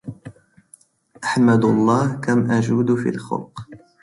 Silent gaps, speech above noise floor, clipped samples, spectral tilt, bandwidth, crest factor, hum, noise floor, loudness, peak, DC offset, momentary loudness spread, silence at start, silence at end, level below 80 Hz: none; 35 dB; under 0.1%; -7 dB/octave; 11.5 kHz; 16 dB; none; -53 dBFS; -19 LUFS; -4 dBFS; under 0.1%; 15 LU; 0.05 s; 0.25 s; -56 dBFS